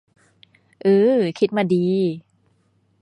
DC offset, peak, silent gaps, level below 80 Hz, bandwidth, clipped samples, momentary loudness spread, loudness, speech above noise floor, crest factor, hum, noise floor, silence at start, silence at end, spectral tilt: under 0.1%; -6 dBFS; none; -68 dBFS; 10.5 kHz; under 0.1%; 8 LU; -19 LUFS; 45 dB; 16 dB; none; -63 dBFS; 0.85 s; 0.85 s; -8 dB/octave